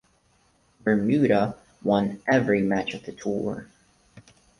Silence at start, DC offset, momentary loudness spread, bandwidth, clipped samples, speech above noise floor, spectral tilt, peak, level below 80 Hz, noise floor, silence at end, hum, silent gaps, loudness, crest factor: 0.85 s; under 0.1%; 11 LU; 11 kHz; under 0.1%; 40 dB; -7 dB/octave; -8 dBFS; -58 dBFS; -64 dBFS; 0.4 s; none; none; -24 LUFS; 18 dB